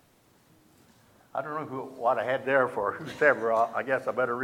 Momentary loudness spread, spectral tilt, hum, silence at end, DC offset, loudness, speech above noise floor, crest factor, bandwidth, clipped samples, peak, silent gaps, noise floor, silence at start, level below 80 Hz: 11 LU; -6 dB/octave; none; 0 s; under 0.1%; -28 LUFS; 35 dB; 22 dB; 16 kHz; under 0.1%; -8 dBFS; none; -62 dBFS; 1.35 s; -72 dBFS